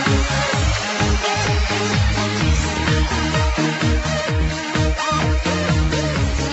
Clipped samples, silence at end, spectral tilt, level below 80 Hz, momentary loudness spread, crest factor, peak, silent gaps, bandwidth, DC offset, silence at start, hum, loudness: under 0.1%; 0 s; -4.5 dB/octave; -24 dBFS; 2 LU; 16 dB; -4 dBFS; none; 8.2 kHz; under 0.1%; 0 s; none; -19 LUFS